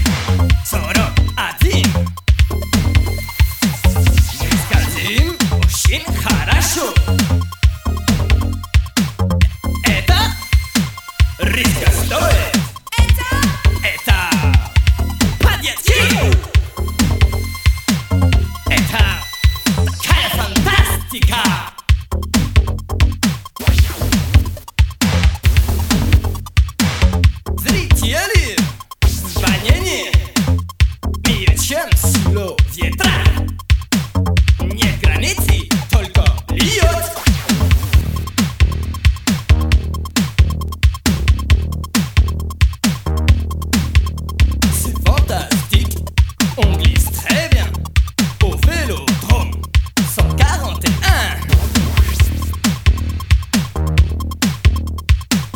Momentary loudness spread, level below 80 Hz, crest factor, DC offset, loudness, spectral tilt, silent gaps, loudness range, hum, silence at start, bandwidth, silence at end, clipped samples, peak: 4 LU; -18 dBFS; 14 dB; under 0.1%; -16 LUFS; -4.5 dB/octave; none; 2 LU; none; 0 s; 19 kHz; 0 s; under 0.1%; 0 dBFS